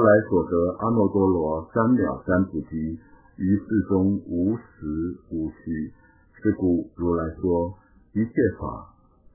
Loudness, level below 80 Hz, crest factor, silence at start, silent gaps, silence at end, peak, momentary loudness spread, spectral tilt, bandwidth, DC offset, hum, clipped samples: -24 LUFS; -44 dBFS; 18 dB; 0 s; none; 0.5 s; -6 dBFS; 11 LU; -15 dB/octave; 2.1 kHz; under 0.1%; none; under 0.1%